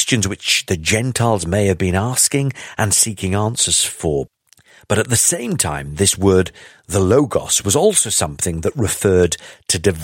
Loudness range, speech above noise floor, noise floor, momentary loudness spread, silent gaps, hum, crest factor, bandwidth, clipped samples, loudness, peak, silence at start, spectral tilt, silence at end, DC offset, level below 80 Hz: 1 LU; 33 dB; -50 dBFS; 7 LU; none; none; 16 dB; 16.5 kHz; under 0.1%; -16 LUFS; 0 dBFS; 0 s; -3.5 dB/octave; 0 s; under 0.1%; -40 dBFS